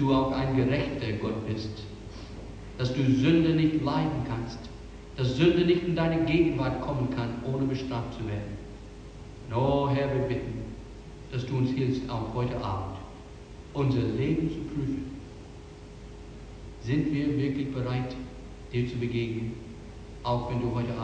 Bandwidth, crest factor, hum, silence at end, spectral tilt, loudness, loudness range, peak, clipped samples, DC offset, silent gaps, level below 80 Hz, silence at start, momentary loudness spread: 8.8 kHz; 18 dB; none; 0 s; -8 dB/octave; -28 LUFS; 6 LU; -10 dBFS; under 0.1%; under 0.1%; none; -46 dBFS; 0 s; 21 LU